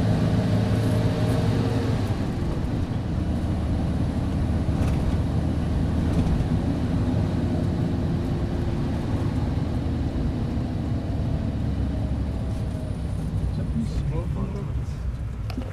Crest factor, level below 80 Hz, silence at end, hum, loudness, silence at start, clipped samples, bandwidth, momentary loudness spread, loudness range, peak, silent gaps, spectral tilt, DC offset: 14 dB; -30 dBFS; 0 s; none; -26 LUFS; 0 s; under 0.1%; 12.5 kHz; 6 LU; 3 LU; -10 dBFS; none; -8 dB/octave; under 0.1%